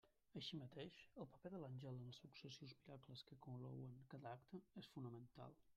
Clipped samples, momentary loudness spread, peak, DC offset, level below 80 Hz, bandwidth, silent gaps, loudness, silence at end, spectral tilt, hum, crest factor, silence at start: under 0.1%; 7 LU; -40 dBFS; under 0.1%; -84 dBFS; 13 kHz; none; -58 LUFS; 0 s; -6.5 dB/octave; none; 16 dB; 0.05 s